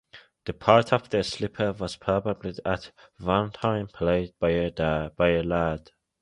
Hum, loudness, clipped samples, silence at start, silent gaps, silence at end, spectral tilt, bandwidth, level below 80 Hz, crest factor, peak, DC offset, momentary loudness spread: none; -26 LUFS; under 0.1%; 0.15 s; none; 0.4 s; -6.5 dB/octave; 11 kHz; -46 dBFS; 24 dB; -2 dBFS; under 0.1%; 11 LU